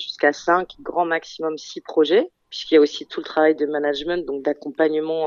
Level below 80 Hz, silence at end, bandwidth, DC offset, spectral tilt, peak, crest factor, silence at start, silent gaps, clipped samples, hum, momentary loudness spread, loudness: -60 dBFS; 0 s; 7.2 kHz; under 0.1%; -4 dB/octave; -4 dBFS; 18 dB; 0 s; none; under 0.1%; none; 11 LU; -21 LUFS